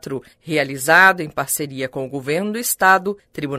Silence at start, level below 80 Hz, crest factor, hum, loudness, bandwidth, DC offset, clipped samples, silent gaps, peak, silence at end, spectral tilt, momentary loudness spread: 0.05 s; -58 dBFS; 18 dB; none; -17 LUFS; 16 kHz; under 0.1%; under 0.1%; none; 0 dBFS; 0 s; -3 dB/octave; 16 LU